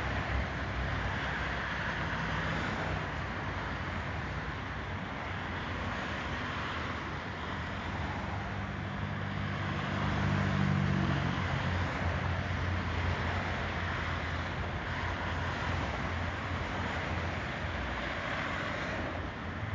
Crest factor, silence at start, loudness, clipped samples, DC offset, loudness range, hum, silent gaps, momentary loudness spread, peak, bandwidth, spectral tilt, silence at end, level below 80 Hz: 16 dB; 0 s; -35 LUFS; under 0.1%; under 0.1%; 5 LU; none; none; 6 LU; -18 dBFS; 7.6 kHz; -6 dB/octave; 0 s; -42 dBFS